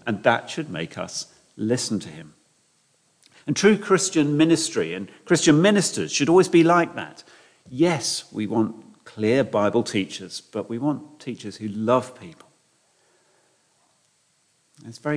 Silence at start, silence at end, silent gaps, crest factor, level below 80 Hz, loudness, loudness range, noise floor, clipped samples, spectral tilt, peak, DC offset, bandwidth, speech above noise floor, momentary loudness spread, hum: 0.05 s; 0 s; none; 20 dB; -68 dBFS; -22 LUFS; 11 LU; -66 dBFS; under 0.1%; -4.5 dB/octave; -4 dBFS; under 0.1%; 10.5 kHz; 44 dB; 18 LU; none